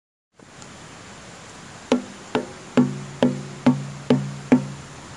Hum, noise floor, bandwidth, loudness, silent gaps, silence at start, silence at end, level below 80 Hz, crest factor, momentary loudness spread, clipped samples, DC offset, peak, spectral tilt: none; -43 dBFS; 11.5 kHz; -23 LUFS; none; 0.55 s; 0 s; -58 dBFS; 24 dB; 19 LU; under 0.1%; under 0.1%; -2 dBFS; -6.5 dB/octave